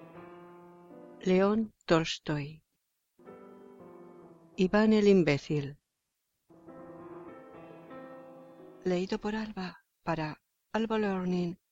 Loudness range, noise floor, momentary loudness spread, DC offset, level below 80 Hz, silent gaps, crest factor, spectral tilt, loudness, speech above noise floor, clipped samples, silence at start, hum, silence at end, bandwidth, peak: 10 LU; -83 dBFS; 26 LU; under 0.1%; -60 dBFS; none; 20 dB; -6.5 dB/octave; -30 LUFS; 55 dB; under 0.1%; 0 s; none; 0.15 s; 7.8 kHz; -12 dBFS